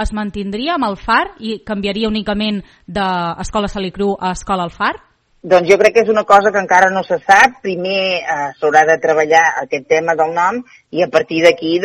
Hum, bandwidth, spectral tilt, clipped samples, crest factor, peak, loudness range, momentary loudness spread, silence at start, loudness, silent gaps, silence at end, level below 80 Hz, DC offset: none; 13 kHz; -4.5 dB/octave; 0.3%; 14 dB; 0 dBFS; 7 LU; 11 LU; 0 s; -14 LUFS; none; 0 s; -38 dBFS; under 0.1%